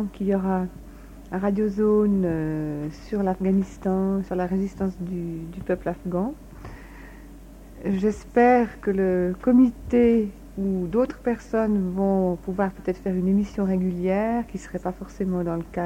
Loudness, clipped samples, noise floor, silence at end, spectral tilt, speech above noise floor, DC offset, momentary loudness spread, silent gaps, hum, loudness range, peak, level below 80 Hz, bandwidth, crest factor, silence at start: -24 LUFS; under 0.1%; -43 dBFS; 0 s; -9 dB/octave; 20 dB; under 0.1%; 13 LU; none; none; 7 LU; -6 dBFS; -44 dBFS; 9.4 kHz; 18 dB; 0 s